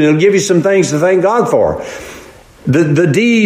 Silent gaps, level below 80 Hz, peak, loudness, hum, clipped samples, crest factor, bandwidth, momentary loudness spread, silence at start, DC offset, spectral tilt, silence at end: none; -44 dBFS; 0 dBFS; -11 LUFS; none; under 0.1%; 12 dB; 15.5 kHz; 14 LU; 0 s; under 0.1%; -6 dB/octave; 0 s